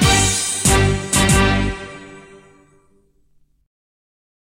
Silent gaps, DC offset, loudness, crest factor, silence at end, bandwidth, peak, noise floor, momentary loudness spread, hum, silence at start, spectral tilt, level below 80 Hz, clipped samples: none; under 0.1%; -15 LUFS; 16 dB; 2.3 s; 16.5 kHz; -4 dBFS; -57 dBFS; 18 LU; none; 0 s; -3.5 dB/octave; -28 dBFS; under 0.1%